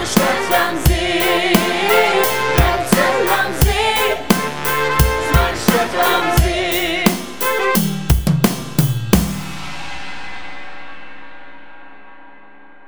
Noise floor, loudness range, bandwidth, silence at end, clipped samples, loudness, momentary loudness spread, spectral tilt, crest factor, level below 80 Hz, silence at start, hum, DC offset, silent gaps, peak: -45 dBFS; 9 LU; over 20 kHz; 0 s; under 0.1%; -16 LUFS; 15 LU; -4.5 dB/octave; 18 dB; -26 dBFS; 0 s; none; 2%; none; 0 dBFS